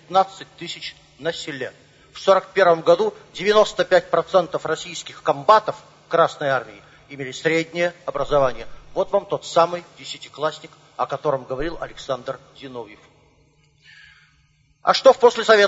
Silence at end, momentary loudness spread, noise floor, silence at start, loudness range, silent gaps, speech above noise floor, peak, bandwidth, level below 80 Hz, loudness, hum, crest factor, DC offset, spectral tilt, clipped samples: 0 s; 19 LU; -60 dBFS; 0.1 s; 10 LU; none; 39 dB; 0 dBFS; 8 kHz; -50 dBFS; -20 LUFS; none; 22 dB; under 0.1%; -4 dB/octave; under 0.1%